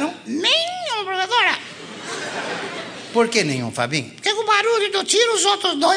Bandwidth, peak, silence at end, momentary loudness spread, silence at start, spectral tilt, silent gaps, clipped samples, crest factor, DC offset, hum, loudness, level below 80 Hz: 10 kHz; -2 dBFS; 0 s; 11 LU; 0 s; -2 dB/octave; none; under 0.1%; 18 dB; under 0.1%; none; -19 LUFS; -72 dBFS